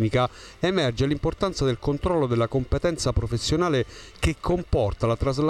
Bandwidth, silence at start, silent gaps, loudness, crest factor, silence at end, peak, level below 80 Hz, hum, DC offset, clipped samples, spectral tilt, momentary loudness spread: 13 kHz; 0 s; none; -25 LUFS; 14 dB; 0 s; -10 dBFS; -36 dBFS; none; under 0.1%; under 0.1%; -6 dB/octave; 4 LU